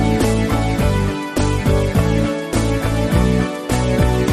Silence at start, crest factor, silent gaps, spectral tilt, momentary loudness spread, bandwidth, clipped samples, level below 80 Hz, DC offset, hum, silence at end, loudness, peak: 0 s; 14 dB; none; -6.5 dB/octave; 3 LU; 13.5 kHz; under 0.1%; -24 dBFS; under 0.1%; none; 0 s; -18 LUFS; -2 dBFS